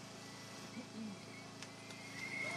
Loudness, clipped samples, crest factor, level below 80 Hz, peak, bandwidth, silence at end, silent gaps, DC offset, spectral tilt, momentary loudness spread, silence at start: -48 LUFS; under 0.1%; 18 dB; -82 dBFS; -30 dBFS; 15.5 kHz; 0 s; none; under 0.1%; -3.5 dB/octave; 6 LU; 0 s